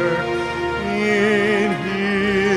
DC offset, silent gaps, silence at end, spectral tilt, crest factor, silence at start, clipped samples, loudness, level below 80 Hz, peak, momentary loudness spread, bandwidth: under 0.1%; none; 0 s; -5.5 dB/octave; 14 dB; 0 s; under 0.1%; -19 LUFS; -46 dBFS; -4 dBFS; 6 LU; 12 kHz